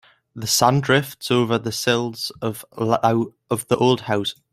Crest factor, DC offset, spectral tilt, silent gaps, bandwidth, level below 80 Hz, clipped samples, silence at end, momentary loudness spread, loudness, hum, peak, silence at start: 20 dB; under 0.1%; -4.5 dB/octave; none; 16 kHz; -58 dBFS; under 0.1%; 0.2 s; 10 LU; -21 LUFS; none; -2 dBFS; 0.35 s